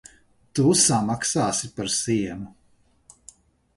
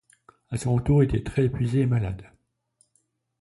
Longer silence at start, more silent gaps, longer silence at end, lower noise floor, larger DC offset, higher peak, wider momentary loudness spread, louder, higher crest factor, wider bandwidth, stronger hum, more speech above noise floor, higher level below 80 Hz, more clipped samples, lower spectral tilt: about the same, 0.55 s vs 0.5 s; neither; about the same, 1.3 s vs 1.2 s; second, -61 dBFS vs -71 dBFS; neither; about the same, -6 dBFS vs -8 dBFS; first, 15 LU vs 12 LU; about the same, -22 LUFS vs -24 LUFS; about the same, 20 dB vs 16 dB; about the same, 12 kHz vs 11.5 kHz; neither; second, 39 dB vs 48 dB; second, -56 dBFS vs -42 dBFS; neither; second, -3.5 dB/octave vs -8 dB/octave